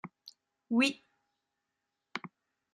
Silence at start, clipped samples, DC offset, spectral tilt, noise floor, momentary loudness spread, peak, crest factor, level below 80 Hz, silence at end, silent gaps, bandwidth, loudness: 0.05 s; under 0.1%; under 0.1%; -3.5 dB/octave; -86 dBFS; 22 LU; -16 dBFS; 22 dB; -86 dBFS; 0.45 s; none; 12.5 kHz; -33 LUFS